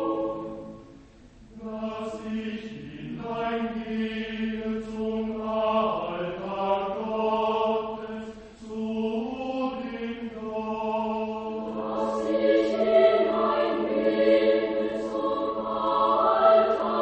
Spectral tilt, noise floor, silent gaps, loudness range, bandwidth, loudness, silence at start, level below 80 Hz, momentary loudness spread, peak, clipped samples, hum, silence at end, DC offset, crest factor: -6.5 dB/octave; -51 dBFS; none; 9 LU; 8.4 kHz; -26 LUFS; 0 s; -56 dBFS; 15 LU; -6 dBFS; under 0.1%; none; 0 s; under 0.1%; 20 dB